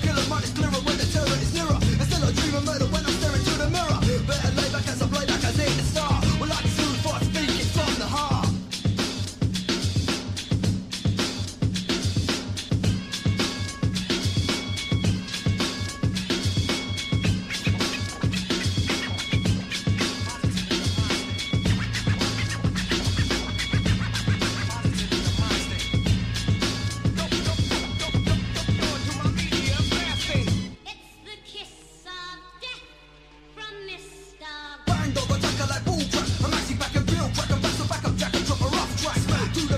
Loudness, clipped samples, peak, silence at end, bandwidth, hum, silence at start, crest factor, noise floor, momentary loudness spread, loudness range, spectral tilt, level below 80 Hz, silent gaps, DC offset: -25 LUFS; under 0.1%; -10 dBFS; 0 s; 15 kHz; none; 0 s; 14 dB; -50 dBFS; 5 LU; 4 LU; -4.5 dB/octave; -36 dBFS; none; under 0.1%